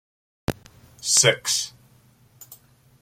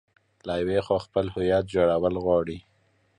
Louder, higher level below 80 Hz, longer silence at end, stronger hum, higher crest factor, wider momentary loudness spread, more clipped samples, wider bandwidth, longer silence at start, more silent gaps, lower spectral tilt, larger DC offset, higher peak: first, -21 LUFS vs -25 LUFS; second, -54 dBFS vs -48 dBFS; second, 0.45 s vs 0.6 s; neither; first, 24 dB vs 16 dB; first, 17 LU vs 11 LU; neither; first, 16.5 kHz vs 10 kHz; about the same, 0.5 s vs 0.45 s; neither; second, -1.5 dB/octave vs -7.5 dB/octave; neither; first, -2 dBFS vs -10 dBFS